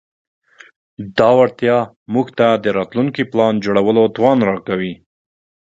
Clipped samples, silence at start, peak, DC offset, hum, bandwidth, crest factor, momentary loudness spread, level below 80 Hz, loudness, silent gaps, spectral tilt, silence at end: under 0.1%; 1 s; 0 dBFS; under 0.1%; none; 7.8 kHz; 16 dB; 9 LU; -56 dBFS; -16 LUFS; 1.96-2.06 s; -7.5 dB/octave; 0.65 s